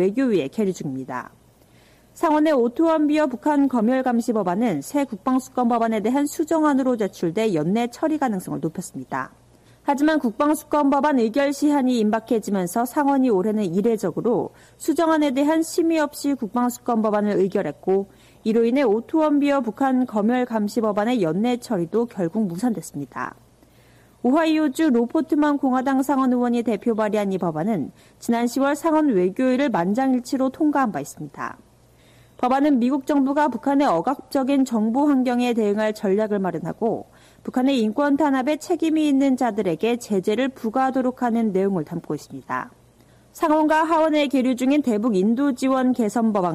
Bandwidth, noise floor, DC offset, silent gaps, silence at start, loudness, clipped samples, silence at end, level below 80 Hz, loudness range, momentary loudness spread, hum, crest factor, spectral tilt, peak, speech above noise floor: 15 kHz; -53 dBFS; under 0.1%; none; 0 s; -21 LUFS; under 0.1%; 0 s; -60 dBFS; 3 LU; 9 LU; none; 10 dB; -6 dB/octave; -10 dBFS; 33 dB